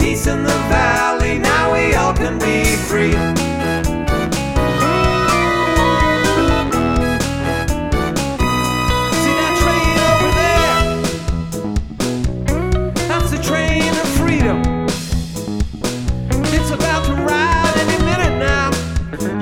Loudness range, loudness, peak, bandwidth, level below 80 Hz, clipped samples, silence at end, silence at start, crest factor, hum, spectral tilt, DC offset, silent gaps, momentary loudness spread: 3 LU; -16 LUFS; 0 dBFS; 17.5 kHz; -24 dBFS; under 0.1%; 0 s; 0 s; 16 dB; none; -5 dB/octave; 1%; none; 8 LU